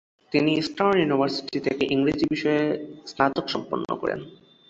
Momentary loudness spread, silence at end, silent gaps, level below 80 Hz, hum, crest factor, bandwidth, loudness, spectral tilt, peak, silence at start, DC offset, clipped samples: 8 LU; 0.35 s; none; -58 dBFS; none; 20 dB; 8 kHz; -24 LUFS; -6 dB/octave; -4 dBFS; 0.3 s; under 0.1%; under 0.1%